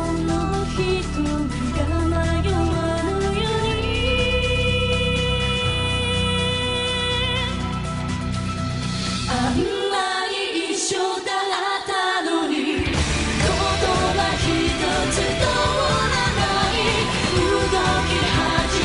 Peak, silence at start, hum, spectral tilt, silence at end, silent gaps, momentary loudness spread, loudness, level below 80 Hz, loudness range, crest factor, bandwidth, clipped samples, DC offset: -4 dBFS; 0 s; none; -4.5 dB/octave; 0 s; none; 5 LU; -21 LUFS; -30 dBFS; 4 LU; 16 dB; 11 kHz; under 0.1%; under 0.1%